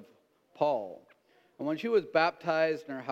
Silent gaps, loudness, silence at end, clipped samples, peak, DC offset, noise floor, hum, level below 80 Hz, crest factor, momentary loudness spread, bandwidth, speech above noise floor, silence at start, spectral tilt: none; -30 LUFS; 0 s; under 0.1%; -10 dBFS; under 0.1%; -65 dBFS; none; -84 dBFS; 20 dB; 9 LU; 8 kHz; 35 dB; 0 s; -6 dB/octave